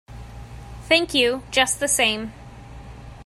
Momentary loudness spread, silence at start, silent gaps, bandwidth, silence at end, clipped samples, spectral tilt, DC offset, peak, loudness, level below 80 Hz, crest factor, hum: 23 LU; 0.1 s; none; 16 kHz; 0 s; under 0.1%; -2 dB/octave; under 0.1%; -2 dBFS; -19 LUFS; -44 dBFS; 22 dB; none